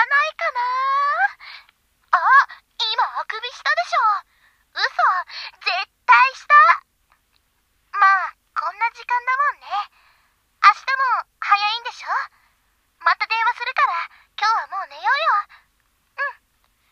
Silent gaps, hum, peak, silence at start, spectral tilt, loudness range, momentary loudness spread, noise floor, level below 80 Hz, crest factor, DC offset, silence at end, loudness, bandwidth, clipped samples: none; none; 0 dBFS; 0 s; 2 dB/octave; 5 LU; 14 LU; -66 dBFS; -70 dBFS; 20 dB; under 0.1%; 0.6 s; -19 LUFS; 8.6 kHz; under 0.1%